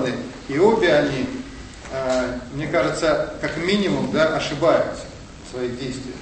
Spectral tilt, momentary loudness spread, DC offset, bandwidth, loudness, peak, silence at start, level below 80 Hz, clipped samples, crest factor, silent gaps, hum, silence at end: -5 dB/octave; 16 LU; under 0.1%; 8.8 kHz; -21 LUFS; -4 dBFS; 0 s; -44 dBFS; under 0.1%; 18 dB; none; none; 0 s